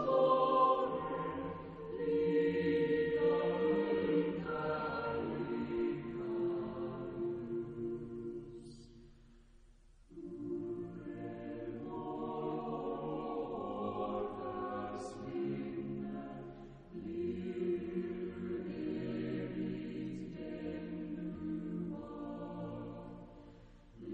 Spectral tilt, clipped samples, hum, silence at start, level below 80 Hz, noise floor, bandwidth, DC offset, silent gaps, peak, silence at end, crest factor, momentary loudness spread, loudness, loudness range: -8 dB/octave; under 0.1%; none; 0 s; -62 dBFS; -62 dBFS; 9.4 kHz; under 0.1%; none; -18 dBFS; 0 s; 20 dB; 14 LU; -38 LUFS; 11 LU